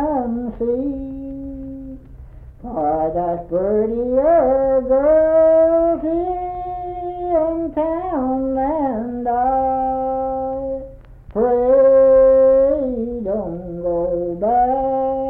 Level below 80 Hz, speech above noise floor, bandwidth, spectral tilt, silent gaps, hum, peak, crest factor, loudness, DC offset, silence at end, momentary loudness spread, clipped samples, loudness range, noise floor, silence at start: -40 dBFS; 22 dB; 3.1 kHz; -11 dB/octave; none; none; -6 dBFS; 12 dB; -18 LUFS; under 0.1%; 0 s; 15 LU; under 0.1%; 7 LU; -38 dBFS; 0 s